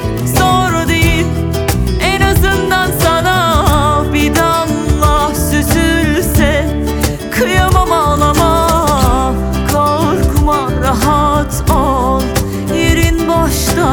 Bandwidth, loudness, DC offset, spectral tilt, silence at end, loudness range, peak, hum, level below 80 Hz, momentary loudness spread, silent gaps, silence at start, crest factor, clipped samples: over 20 kHz; -12 LUFS; under 0.1%; -5 dB/octave; 0 s; 1 LU; 0 dBFS; none; -18 dBFS; 4 LU; none; 0 s; 12 dB; under 0.1%